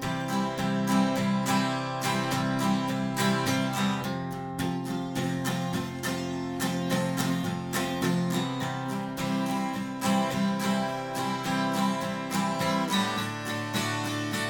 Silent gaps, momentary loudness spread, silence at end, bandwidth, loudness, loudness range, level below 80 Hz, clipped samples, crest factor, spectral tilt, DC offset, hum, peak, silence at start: none; 6 LU; 0 s; 17 kHz; -29 LUFS; 3 LU; -60 dBFS; under 0.1%; 16 dB; -5 dB/octave; under 0.1%; none; -12 dBFS; 0 s